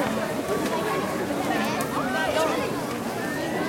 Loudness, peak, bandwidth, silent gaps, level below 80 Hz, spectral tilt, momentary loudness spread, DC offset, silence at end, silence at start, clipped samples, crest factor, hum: -26 LUFS; -8 dBFS; 17 kHz; none; -56 dBFS; -4.5 dB/octave; 5 LU; under 0.1%; 0 s; 0 s; under 0.1%; 18 dB; none